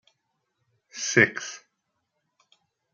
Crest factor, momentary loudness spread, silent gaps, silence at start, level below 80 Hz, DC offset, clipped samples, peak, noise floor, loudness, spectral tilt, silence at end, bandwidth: 26 dB; 23 LU; none; 0.95 s; -74 dBFS; under 0.1%; under 0.1%; -4 dBFS; -78 dBFS; -23 LUFS; -3 dB/octave; 1.35 s; 10 kHz